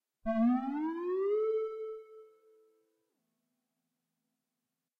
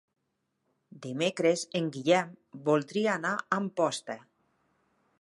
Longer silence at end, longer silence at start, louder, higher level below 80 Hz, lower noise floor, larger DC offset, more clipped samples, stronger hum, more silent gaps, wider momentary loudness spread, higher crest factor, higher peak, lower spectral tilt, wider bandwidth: first, 2.75 s vs 1.05 s; second, 0.25 s vs 0.95 s; second, -33 LUFS vs -29 LUFS; first, -68 dBFS vs -80 dBFS; first, -89 dBFS vs -80 dBFS; neither; neither; neither; neither; about the same, 13 LU vs 14 LU; about the same, 16 dB vs 20 dB; second, -20 dBFS vs -12 dBFS; first, -9 dB/octave vs -4.5 dB/octave; second, 4.5 kHz vs 11.5 kHz